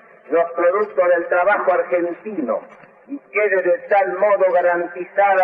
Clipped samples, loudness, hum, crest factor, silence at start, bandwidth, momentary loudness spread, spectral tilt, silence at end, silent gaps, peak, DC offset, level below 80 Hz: under 0.1%; -18 LUFS; none; 12 dB; 0.3 s; 3.7 kHz; 9 LU; -8 dB/octave; 0 s; none; -6 dBFS; under 0.1%; -72 dBFS